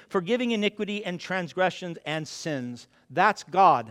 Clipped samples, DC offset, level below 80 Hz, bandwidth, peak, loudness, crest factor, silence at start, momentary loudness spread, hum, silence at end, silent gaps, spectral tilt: under 0.1%; under 0.1%; -72 dBFS; 13 kHz; -6 dBFS; -26 LUFS; 20 dB; 0.1 s; 13 LU; none; 0 s; none; -5 dB/octave